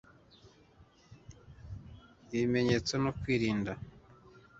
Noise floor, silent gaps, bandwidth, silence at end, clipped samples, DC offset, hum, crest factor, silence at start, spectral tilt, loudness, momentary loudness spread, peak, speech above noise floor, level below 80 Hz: -62 dBFS; none; 8 kHz; 0.2 s; under 0.1%; under 0.1%; none; 22 dB; 0.45 s; -5.5 dB/octave; -32 LUFS; 25 LU; -14 dBFS; 31 dB; -56 dBFS